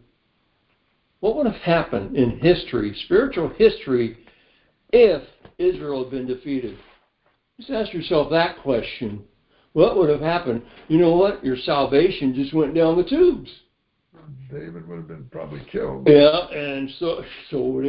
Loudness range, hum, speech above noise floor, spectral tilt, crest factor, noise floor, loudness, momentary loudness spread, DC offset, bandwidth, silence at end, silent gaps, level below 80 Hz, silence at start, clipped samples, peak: 6 LU; none; 47 dB; -11 dB/octave; 20 dB; -67 dBFS; -20 LUFS; 17 LU; under 0.1%; 5.4 kHz; 0 s; none; -48 dBFS; 1.2 s; under 0.1%; 0 dBFS